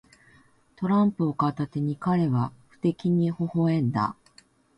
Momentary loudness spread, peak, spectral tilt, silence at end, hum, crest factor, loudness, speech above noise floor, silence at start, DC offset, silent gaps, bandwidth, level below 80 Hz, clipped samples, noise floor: 6 LU; -10 dBFS; -9.5 dB/octave; 0.65 s; none; 16 dB; -26 LUFS; 34 dB; 0.8 s; under 0.1%; none; 8.2 kHz; -62 dBFS; under 0.1%; -59 dBFS